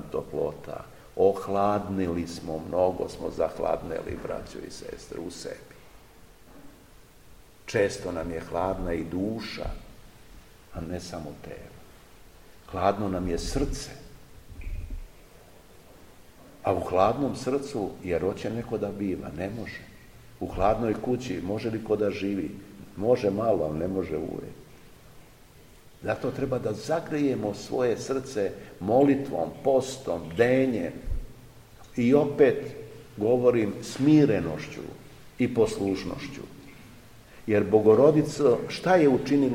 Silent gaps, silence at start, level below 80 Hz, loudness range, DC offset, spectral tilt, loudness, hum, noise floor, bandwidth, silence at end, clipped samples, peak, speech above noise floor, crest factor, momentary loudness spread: none; 0 s; -46 dBFS; 10 LU; 0.1%; -6.5 dB/octave; -27 LUFS; none; -53 dBFS; 16.5 kHz; 0 s; under 0.1%; -6 dBFS; 26 dB; 22 dB; 18 LU